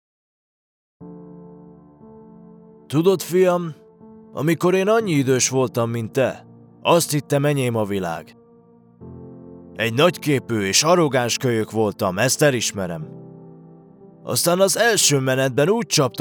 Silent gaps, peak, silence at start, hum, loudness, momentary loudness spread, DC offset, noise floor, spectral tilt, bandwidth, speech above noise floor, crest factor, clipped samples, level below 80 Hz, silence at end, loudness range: none; -2 dBFS; 1 s; none; -19 LUFS; 20 LU; under 0.1%; -51 dBFS; -4 dB/octave; over 20 kHz; 32 dB; 18 dB; under 0.1%; -68 dBFS; 0 s; 5 LU